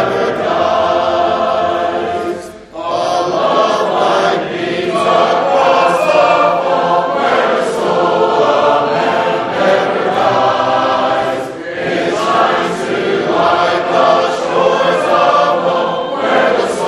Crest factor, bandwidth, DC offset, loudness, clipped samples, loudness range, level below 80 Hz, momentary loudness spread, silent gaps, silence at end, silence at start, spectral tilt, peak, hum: 12 dB; 12.5 kHz; under 0.1%; -13 LUFS; under 0.1%; 3 LU; -52 dBFS; 6 LU; none; 0 s; 0 s; -4.5 dB/octave; 0 dBFS; none